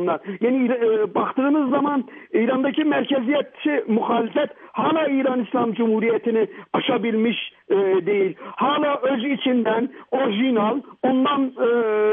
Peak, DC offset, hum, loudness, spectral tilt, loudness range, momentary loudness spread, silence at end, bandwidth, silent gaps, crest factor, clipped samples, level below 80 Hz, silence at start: -8 dBFS; under 0.1%; none; -21 LUFS; -9.5 dB/octave; 1 LU; 5 LU; 0 s; 3.8 kHz; none; 14 dB; under 0.1%; -76 dBFS; 0 s